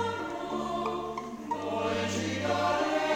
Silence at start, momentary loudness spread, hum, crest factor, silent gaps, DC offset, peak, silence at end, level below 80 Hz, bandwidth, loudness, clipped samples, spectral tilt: 0 s; 8 LU; none; 16 dB; none; under 0.1%; -16 dBFS; 0 s; -60 dBFS; 17.5 kHz; -31 LUFS; under 0.1%; -4.5 dB/octave